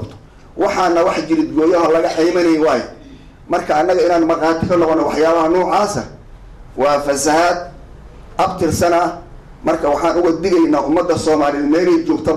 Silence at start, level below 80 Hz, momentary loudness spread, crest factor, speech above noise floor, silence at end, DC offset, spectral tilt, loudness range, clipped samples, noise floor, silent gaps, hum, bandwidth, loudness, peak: 0 s; -40 dBFS; 8 LU; 8 dB; 24 dB; 0 s; under 0.1%; -5 dB/octave; 2 LU; under 0.1%; -38 dBFS; none; none; 13.5 kHz; -15 LUFS; -8 dBFS